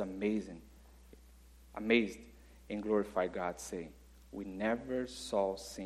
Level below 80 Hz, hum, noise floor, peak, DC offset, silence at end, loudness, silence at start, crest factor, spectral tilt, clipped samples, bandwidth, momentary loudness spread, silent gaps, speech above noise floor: -60 dBFS; none; -59 dBFS; -16 dBFS; under 0.1%; 0 s; -36 LUFS; 0 s; 22 dB; -5 dB/octave; under 0.1%; 14.5 kHz; 19 LU; none; 23 dB